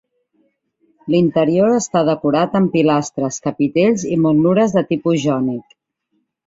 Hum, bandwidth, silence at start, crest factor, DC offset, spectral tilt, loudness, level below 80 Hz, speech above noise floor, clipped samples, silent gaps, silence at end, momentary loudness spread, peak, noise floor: none; 7.8 kHz; 1.05 s; 14 dB; under 0.1%; -6.5 dB/octave; -16 LUFS; -56 dBFS; 53 dB; under 0.1%; none; 0.85 s; 7 LU; -2 dBFS; -69 dBFS